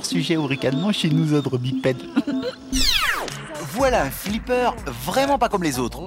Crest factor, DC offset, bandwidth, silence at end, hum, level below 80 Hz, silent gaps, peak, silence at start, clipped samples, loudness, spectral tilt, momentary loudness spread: 16 dB; under 0.1%; 16.5 kHz; 0 s; none; -36 dBFS; none; -6 dBFS; 0 s; under 0.1%; -22 LUFS; -4.5 dB/octave; 8 LU